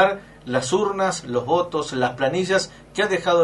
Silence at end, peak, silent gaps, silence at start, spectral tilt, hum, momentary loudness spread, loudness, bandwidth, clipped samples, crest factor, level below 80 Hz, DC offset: 0 s; -4 dBFS; none; 0 s; -4 dB/octave; none; 5 LU; -22 LUFS; 11.5 kHz; under 0.1%; 18 dB; -54 dBFS; under 0.1%